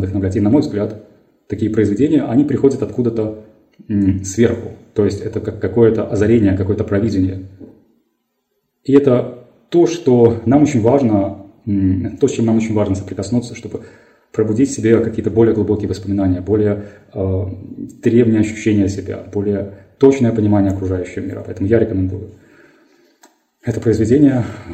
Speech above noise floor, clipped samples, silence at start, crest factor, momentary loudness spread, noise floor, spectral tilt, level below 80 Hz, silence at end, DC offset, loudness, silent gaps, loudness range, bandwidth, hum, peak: 54 dB; under 0.1%; 0 s; 16 dB; 13 LU; -69 dBFS; -8 dB/octave; -50 dBFS; 0 s; under 0.1%; -16 LUFS; none; 4 LU; 9 kHz; none; 0 dBFS